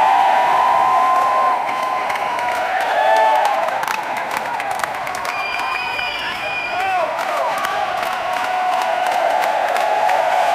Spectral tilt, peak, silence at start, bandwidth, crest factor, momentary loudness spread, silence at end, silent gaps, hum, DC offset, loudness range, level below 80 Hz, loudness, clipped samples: -2 dB/octave; 0 dBFS; 0 s; 16 kHz; 18 dB; 7 LU; 0 s; none; none; under 0.1%; 5 LU; -58 dBFS; -18 LUFS; under 0.1%